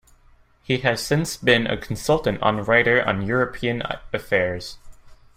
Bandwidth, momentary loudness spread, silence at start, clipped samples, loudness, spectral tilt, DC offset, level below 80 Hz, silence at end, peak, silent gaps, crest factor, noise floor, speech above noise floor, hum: 16 kHz; 9 LU; 0.7 s; under 0.1%; -21 LUFS; -5 dB/octave; under 0.1%; -46 dBFS; 0.25 s; -4 dBFS; none; 18 dB; -54 dBFS; 33 dB; none